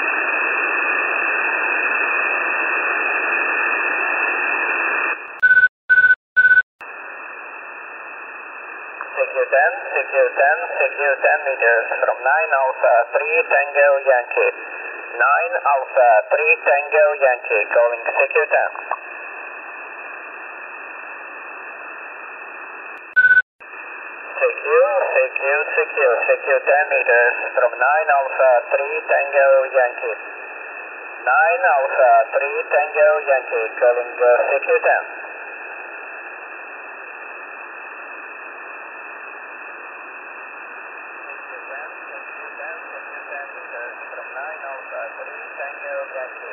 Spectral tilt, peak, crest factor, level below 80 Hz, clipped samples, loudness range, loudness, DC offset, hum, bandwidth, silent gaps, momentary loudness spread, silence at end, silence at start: -5.5 dB/octave; -2 dBFS; 16 dB; -72 dBFS; under 0.1%; 16 LU; -17 LUFS; under 0.1%; none; 4.2 kHz; 5.69-5.88 s, 6.16-6.36 s, 6.63-6.79 s, 23.42-23.59 s; 18 LU; 0 s; 0 s